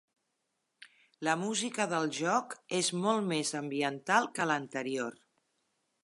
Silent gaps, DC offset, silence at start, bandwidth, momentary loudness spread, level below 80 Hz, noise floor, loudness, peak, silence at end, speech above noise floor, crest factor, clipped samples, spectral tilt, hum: none; under 0.1%; 0.8 s; 11.5 kHz; 7 LU; -84 dBFS; -82 dBFS; -32 LUFS; -12 dBFS; 0.9 s; 50 dB; 22 dB; under 0.1%; -3.5 dB/octave; none